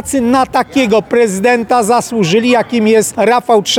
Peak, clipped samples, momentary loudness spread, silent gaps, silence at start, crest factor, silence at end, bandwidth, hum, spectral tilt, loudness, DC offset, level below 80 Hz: 0 dBFS; under 0.1%; 2 LU; none; 0.05 s; 10 dB; 0 s; 19 kHz; none; -4 dB/octave; -11 LUFS; under 0.1%; -46 dBFS